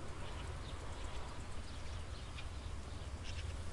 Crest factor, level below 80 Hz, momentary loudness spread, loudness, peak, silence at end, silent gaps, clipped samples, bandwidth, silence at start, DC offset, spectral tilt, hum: 12 dB; -48 dBFS; 3 LU; -48 LUFS; -32 dBFS; 0 s; none; under 0.1%; 11.5 kHz; 0 s; under 0.1%; -4.5 dB/octave; none